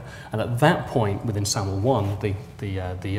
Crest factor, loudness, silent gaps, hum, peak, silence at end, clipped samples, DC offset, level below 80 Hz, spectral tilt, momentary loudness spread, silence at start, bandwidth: 22 dB; -24 LUFS; none; none; -2 dBFS; 0 s; under 0.1%; under 0.1%; -48 dBFS; -5.5 dB/octave; 10 LU; 0 s; 16 kHz